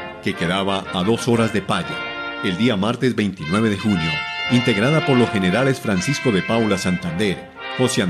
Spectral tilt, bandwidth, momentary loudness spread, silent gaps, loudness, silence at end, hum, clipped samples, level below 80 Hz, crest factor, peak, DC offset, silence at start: -5.5 dB/octave; 14 kHz; 7 LU; none; -20 LUFS; 0 s; none; under 0.1%; -46 dBFS; 16 dB; -4 dBFS; under 0.1%; 0 s